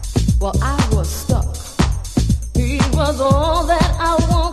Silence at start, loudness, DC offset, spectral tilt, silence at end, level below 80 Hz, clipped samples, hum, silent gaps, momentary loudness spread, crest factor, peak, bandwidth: 0 s; -18 LUFS; under 0.1%; -5.5 dB/octave; 0 s; -20 dBFS; under 0.1%; none; none; 4 LU; 16 dB; 0 dBFS; 14 kHz